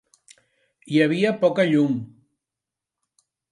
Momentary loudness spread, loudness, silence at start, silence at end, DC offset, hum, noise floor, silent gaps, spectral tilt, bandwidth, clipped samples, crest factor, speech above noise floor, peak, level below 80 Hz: 9 LU; -21 LUFS; 0.9 s; 1.45 s; under 0.1%; none; -87 dBFS; none; -7 dB/octave; 11.5 kHz; under 0.1%; 18 dB; 67 dB; -6 dBFS; -72 dBFS